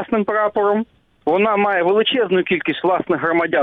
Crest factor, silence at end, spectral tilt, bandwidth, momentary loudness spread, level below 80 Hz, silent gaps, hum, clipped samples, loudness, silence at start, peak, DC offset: 12 dB; 0 s; -8 dB/octave; 4.4 kHz; 5 LU; -58 dBFS; none; none; under 0.1%; -18 LUFS; 0 s; -6 dBFS; under 0.1%